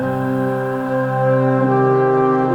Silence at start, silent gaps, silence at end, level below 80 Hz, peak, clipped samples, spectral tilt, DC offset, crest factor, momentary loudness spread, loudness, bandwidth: 0 s; none; 0 s; -52 dBFS; -4 dBFS; under 0.1%; -9.5 dB/octave; under 0.1%; 12 dB; 5 LU; -17 LUFS; 8 kHz